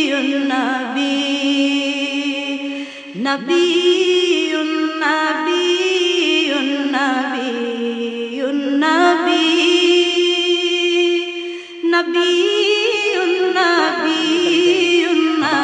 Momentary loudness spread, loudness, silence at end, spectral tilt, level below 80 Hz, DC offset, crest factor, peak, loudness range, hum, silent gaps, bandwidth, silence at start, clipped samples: 8 LU; -16 LUFS; 0 s; -2.5 dB/octave; -70 dBFS; under 0.1%; 16 dB; -2 dBFS; 3 LU; none; none; 9.6 kHz; 0 s; under 0.1%